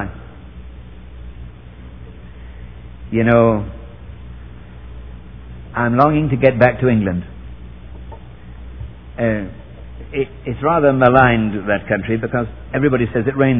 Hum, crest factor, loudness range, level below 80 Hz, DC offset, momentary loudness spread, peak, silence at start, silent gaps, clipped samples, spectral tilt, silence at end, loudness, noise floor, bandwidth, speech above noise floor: none; 18 dB; 9 LU; -36 dBFS; 0.7%; 25 LU; 0 dBFS; 0 s; none; under 0.1%; -11 dB/octave; 0 s; -16 LUFS; -36 dBFS; 5.4 kHz; 21 dB